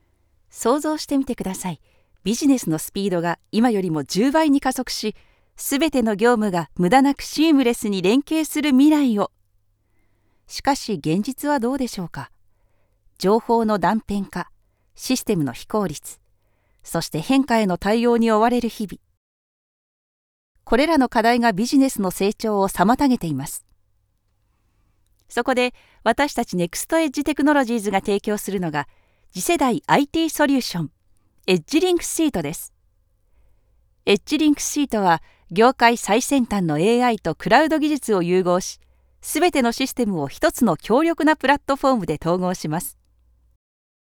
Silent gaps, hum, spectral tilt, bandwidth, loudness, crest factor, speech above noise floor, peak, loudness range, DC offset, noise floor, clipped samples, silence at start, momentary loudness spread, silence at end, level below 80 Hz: 19.17-20.55 s; none; -4.5 dB/octave; 19.5 kHz; -20 LUFS; 20 dB; 46 dB; 0 dBFS; 5 LU; under 0.1%; -66 dBFS; under 0.1%; 0.55 s; 11 LU; 1.1 s; -48 dBFS